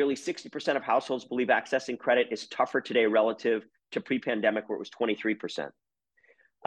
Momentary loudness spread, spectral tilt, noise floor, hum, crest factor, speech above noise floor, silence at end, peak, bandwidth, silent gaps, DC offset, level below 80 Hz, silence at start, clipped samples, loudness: 10 LU; -4.5 dB/octave; -66 dBFS; none; 18 dB; 38 dB; 0.95 s; -12 dBFS; 10 kHz; none; under 0.1%; -80 dBFS; 0 s; under 0.1%; -29 LUFS